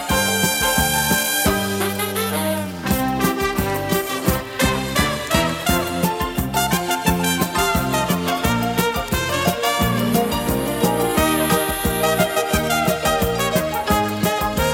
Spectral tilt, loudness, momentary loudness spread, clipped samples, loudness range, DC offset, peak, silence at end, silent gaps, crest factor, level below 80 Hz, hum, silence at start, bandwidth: -4 dB/octave; -19 LUFS; 4 LU; under 0.1%; 2 LU; under 0.1%; -2 dBFS; 0 s; none; 16 dB; -34 dBFS; none; 0 s; 17 kHz